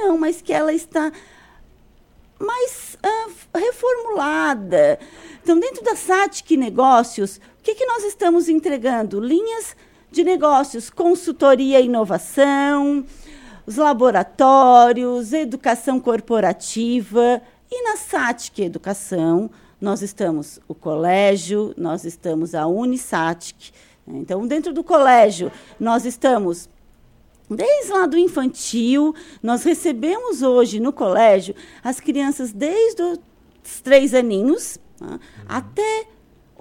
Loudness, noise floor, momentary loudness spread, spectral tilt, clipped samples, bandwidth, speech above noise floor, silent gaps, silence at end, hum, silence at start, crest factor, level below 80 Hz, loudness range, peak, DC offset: -18 LUFS; -52 dBFS; 13 LU; -4.5 dB/octave; under 0.1%; 16.5 kHz; 34 dB; none; 0.55 s; none; 0 s; 18 dB; -54 dBFS; 7 LU; 0 dBFS; under 0.1%